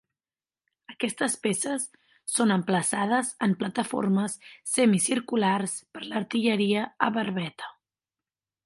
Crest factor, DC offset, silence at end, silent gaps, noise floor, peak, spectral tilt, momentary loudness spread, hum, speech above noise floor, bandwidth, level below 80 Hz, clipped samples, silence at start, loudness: 22 dB; under 0.1%; 0.95 s; none; under -90 dBFS; -4 dBFS; -4 dB/octave; 10 LU; none; over 64 dB; 11.5 kHz; -74 dBFS; under 0.1%; 0.9 s; -26 LUFS